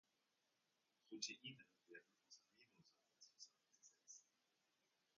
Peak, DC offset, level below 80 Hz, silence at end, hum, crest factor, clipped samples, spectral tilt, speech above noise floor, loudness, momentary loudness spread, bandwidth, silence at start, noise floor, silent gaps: -32 dBFS; under 0.1%; under -90 dBFS; 0.95 s; none; 32 dB; under 0.1%; -2 dB/octave; 30 dB; -57 LUFS; 18 LU; 7.2 kHz; 1.05 s; -88 dBFS; none